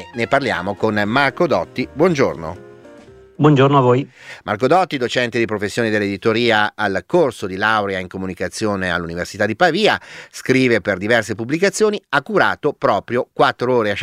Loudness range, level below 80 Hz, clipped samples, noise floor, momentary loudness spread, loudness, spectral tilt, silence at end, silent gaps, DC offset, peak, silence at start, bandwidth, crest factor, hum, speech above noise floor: 2 LU; -52 dBFS; under 0.1%; -43 dBFS; 10 LU; -17 LUFS; -5.5 dB/octave; 0 s; none; under 0.1%; 0 dBFS; 0 s; 15 kHz; 16 dB; none; 25 dB